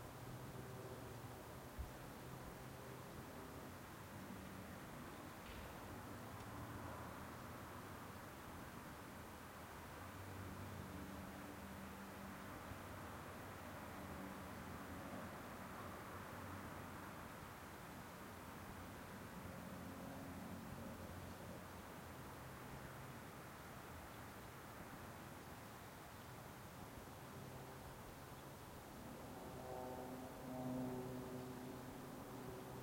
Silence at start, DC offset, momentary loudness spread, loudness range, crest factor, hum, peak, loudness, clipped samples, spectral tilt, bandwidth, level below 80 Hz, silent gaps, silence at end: 0 s; under 0.1%; 4 LU; 4 LU; 18 dB; none; -36 dBFS; -53 LUFS; under 0.1%; -5 dB/octave; 16.5 kHz; -68 dBFS; none; 0 s